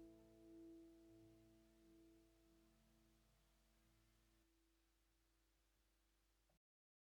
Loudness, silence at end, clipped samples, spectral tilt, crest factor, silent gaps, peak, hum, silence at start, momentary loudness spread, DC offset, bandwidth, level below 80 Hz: -66 LUFS; 0.55 s; under 0.1%; -5.5 dB/octave; 16 dB; none; -54 dBFS; 50 Hz at -80 dBFS; 0 s; 5 LU; under 0.1%; 12 kHz; -82 dBFS